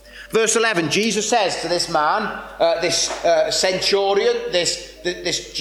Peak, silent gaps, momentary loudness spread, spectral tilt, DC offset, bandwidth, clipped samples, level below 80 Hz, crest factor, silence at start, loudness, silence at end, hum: -4 dBFS; none; 6 LU; -2 dB/octave; under 0.1%; 16 kHz; under 0.1%; -50 dBFS; 14 dB; 0.05 s; -19 LUFS; 0 s; none